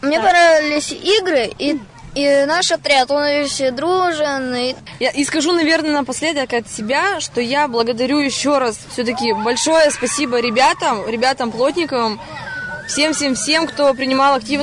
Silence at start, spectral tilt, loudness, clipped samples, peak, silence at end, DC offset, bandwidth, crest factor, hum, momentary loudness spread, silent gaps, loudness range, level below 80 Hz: 0 s; -2.5 dB/octave; -16 LUFS; under 0.1%; -4 dBFS; 0 s; under 0.1%; 11 kHz; 12 dB; none; 7 LU; none; 2 LU; -50 dBFS